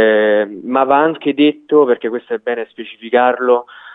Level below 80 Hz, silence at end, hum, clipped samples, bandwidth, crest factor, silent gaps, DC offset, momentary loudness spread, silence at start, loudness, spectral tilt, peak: -70 dBFS; 0 s; none; under 0.1%; 4 kHz; 14 dB; none; under 0.1%; 9 LU; 0 s; -15 LUFS; -8 dB/octave; 0 dBFS